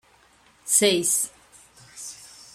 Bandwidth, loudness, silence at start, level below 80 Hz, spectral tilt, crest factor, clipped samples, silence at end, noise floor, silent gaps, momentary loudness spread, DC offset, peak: 16 kHz; -21 LUFS; 0.65 s; -68 dBFS; -1.5 dB/octave; 24 dB; under 0.1%; 0.3 s; -58 dBFS; none; 21 LU; under 0.1%; -4 dBFS